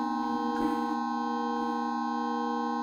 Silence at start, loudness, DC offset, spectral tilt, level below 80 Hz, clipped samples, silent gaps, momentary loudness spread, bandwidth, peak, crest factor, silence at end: 0 s; -31 LUFS; under 0.1%; -5 dB/octave; -66 dBFS; under 0.1%; none; 2 LU; 12.5 kHz; -18 dBFS; 12 dB; 0 s